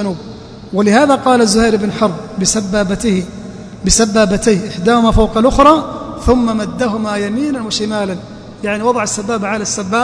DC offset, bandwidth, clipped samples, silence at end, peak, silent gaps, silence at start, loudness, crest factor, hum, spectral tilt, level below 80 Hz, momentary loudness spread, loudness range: under 0.1%; 11 kHz; 0.2%; 0 s; 0 dBFS; none; 0 s; -13 LUFS; 14 dB; none; -4.5 dB/octave; -28 dBFS; 13 LU; 5 LU